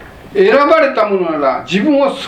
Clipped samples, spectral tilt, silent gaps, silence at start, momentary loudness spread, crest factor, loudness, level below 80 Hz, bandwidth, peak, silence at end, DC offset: under 0.1%; -6 dB/octave; none; 0 s; 6 LU; 12 dB; -12 LUFS; -48 dBFS; 9.8 kHz; 0 dBFS; 0 s; under 0.1%